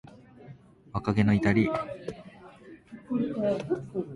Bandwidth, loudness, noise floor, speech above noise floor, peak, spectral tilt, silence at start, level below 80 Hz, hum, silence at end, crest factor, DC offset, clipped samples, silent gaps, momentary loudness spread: 10.5 kHz; -28 LUFS; -51 dBFS; 24 dB; -10 dBFS; -8 dB/octave; 0.05 s; -52 dBFS; none; 0 s; 18 dB; under 0.1%; under 0.1%; none; 24 LU